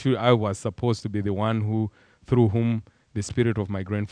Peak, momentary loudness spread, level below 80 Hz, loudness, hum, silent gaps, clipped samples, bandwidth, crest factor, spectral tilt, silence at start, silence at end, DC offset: -6 dBFS; 10 LU; -52 dBFS; -25 LUFS; none; none; under 0.1%; 10 kHz; 18 dB; -7 dB/octave; 0 s; 0.05 s; under 0.1%